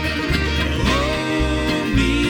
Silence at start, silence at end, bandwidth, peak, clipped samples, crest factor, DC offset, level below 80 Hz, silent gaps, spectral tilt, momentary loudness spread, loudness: 0 s; 0 s; 18.5 kHz; -4 dBFS; under 0.1%; 14 dB; under 0.1%; -26 dBFS; none; -5 dB/octave; 2 LU; -19 LUFS